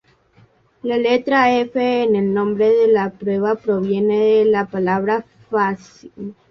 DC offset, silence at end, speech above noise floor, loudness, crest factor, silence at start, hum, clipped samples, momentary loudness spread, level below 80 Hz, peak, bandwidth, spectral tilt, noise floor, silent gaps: under 0.1%; 0.2 s; 37 dB; -17 LUFS; 14 dB; 0.85 s; none; under 0.1%; 9 LU; -58 dBFS; -2 dBFS; 6.6 kHz; -7 dB/octave; -54 dBFS; none